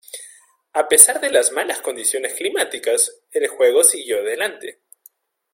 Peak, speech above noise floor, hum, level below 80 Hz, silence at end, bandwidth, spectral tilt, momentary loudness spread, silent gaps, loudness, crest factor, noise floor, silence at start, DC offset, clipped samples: 0 dBFS; 36 dB; none; -68 dBFS; 0.8 s; 16.5 kHz; 1 dB/octave; 16 LU; none; -16 LUFS; 20 dB; -54 dBFS; 0.15 s; under 0.1%; under 0.1%